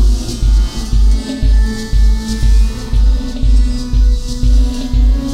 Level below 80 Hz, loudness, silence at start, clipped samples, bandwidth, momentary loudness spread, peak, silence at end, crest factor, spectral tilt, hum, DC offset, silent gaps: -12 dBFS; -15 LUFS; 0 s; under 0.1%; 10 kHz; 3 LU; -2 dBFS; 0 s; 10 dB; -6 dB/octave; none; 0.6%; none